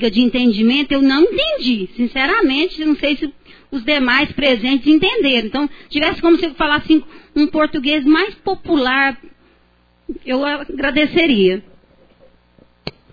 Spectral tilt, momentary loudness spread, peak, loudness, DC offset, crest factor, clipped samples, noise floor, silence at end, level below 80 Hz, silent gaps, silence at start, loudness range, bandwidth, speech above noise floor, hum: -6 dB/octave; 10 LU; -2 dBFS; -15 LUFS; under 0.1%; 16 dB; under 0.1%; -55 dBFS; 0.25 s; -40 dBFS; none; 0 s; 4 LU; 5 kHz; 40 dB; none